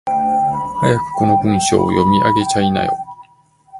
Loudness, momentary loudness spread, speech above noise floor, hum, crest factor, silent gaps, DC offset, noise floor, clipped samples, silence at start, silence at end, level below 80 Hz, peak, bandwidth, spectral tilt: -15 LUFS; 6 LU; 37 dB; none; 16 dB; none; under 0.1%; -51 dBFS; under 0.1%; 0.05 s; 0 s; -42 dBFS; 0 dBFS; 11.5 kHz; -5.5 dB/octave